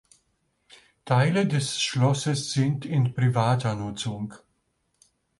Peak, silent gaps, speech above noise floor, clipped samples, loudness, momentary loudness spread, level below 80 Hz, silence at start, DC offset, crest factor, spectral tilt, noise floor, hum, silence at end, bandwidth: -8 dBFS; none; 49 dB; under 0.1%; -25 LUFS; 9 LU; -60 dBFS; 1.05 s; under 0.1%; 18 dB; -5.5 dB/octave; -73 dBFS; none; 1 s; 11.5 kHz